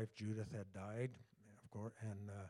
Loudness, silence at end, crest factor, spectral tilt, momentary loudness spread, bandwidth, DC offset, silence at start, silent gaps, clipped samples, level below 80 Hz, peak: -49 LUFS; 0 s; 16 dB; -7.5 dB/octave; 18 LU; 11.5 kHz; under 0.1%; 0 s; none; under 0.1%; -80 dBFS; -32 dBFS